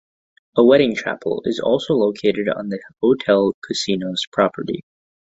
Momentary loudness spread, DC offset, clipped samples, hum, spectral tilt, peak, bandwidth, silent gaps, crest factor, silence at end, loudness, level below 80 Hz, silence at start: 11 LU; under 0.1%; under 0.1%; none; -5.5 dB/octave; -2 dBFS; 8.2 kHz; 3.54-3.62 s, 4.27-4.32 s; 18 dB; 0.6 s; -19 LUFS; -58 dBFS; 0.55 s